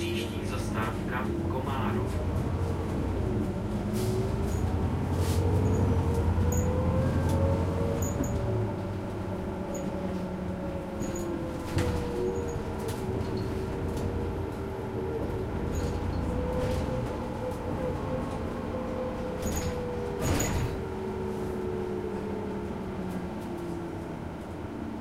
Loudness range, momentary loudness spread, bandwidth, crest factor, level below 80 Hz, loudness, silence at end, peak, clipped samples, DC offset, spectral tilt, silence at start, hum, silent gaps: 5 LU; 7 LU; 15.5 kHz; 16 dB; -40 dBFS; -31 LUFS; 0 s; -14 dBFS; under 0.1%; under 0.1%; -6.5 dB/octave; 0 s; none; none